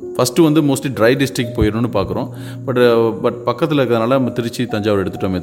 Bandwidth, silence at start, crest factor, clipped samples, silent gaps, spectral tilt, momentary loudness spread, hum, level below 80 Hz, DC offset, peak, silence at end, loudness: 17 kHz; 0 s; 16 dB; under 0.1%; none; -6 dB/octave; 8 LU; none; -38 dBFS; under 0.1%; 0 dBFS; 0 s; -16 LUFS